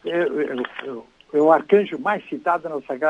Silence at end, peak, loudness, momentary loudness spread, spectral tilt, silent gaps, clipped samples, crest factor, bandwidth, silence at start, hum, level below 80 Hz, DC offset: 0 s; -2 dBFS; -21 LUFS; 14 LU; -7 dB/octave; none; under 0.1%; 18 dB; 7.4 kHz; 0.05 s; none; -70 dBFS; under 0.1%